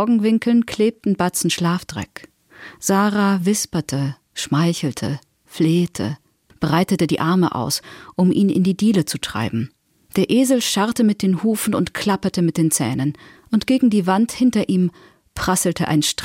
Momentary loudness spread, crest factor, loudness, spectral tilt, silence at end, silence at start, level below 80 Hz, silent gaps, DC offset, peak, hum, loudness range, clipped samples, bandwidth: 10 LU; 14 dB; -19 LUFS; -5 dB/octave; 0 s; 0 s; -52 dBFS; none; under 0.1%; -6 dBFS; none; 2 LU; under 0.1%; 16.5 kHz